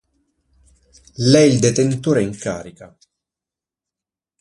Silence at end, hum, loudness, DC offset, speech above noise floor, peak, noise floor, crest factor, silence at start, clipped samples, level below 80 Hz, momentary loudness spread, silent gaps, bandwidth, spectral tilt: 1.55 s; none; -16 LUFS; under 0.1%; 72 dB; 0 dBFS; -88 dBFS; 20 dB; 1.2 s; under 0.1%; -52 dBFS; 16 LU; none; 11.5 kHz; -5.5 dB/octave